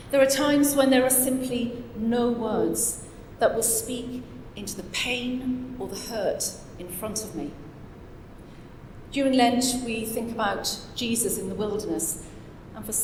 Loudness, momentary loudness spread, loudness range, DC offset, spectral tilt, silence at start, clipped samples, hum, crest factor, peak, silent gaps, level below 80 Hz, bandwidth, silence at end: -25 LUFS; 23 LU; 8 LU; under 0.1%; -3 dB/octave; 0 s; under 0.1%; none; 20 dB; -8 dBFS; none; -48 dBFS; 17.5 kHz; 0 s